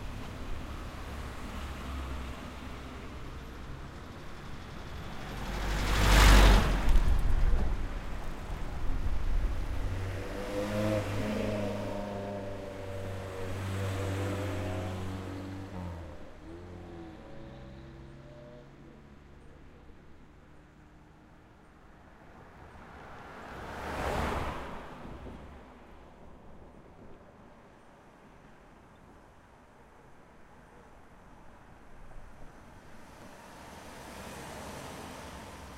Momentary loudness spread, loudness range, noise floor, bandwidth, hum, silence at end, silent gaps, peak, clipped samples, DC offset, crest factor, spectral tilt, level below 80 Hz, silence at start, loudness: 24 LU; 28 LU; -56 dBFS; 16 kHz; none; 0 s; none; -8 dBFS; under 0.1%; under 0.1%; 24 dB; -5 dB/octave; -36 dBFS; 0 s; -34 LUFS